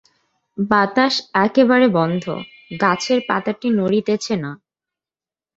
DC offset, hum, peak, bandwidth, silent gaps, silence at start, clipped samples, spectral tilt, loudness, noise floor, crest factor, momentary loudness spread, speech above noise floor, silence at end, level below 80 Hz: under 0.1%; none; 0 dBFS; 8 kHz; none; 0.55 s; under 0.1%; -5.5 dB/octave; -18 LUFS; under -90 dBFS; 18 dB; 14 LU; over 73 dB; 1 s; -60 dBFS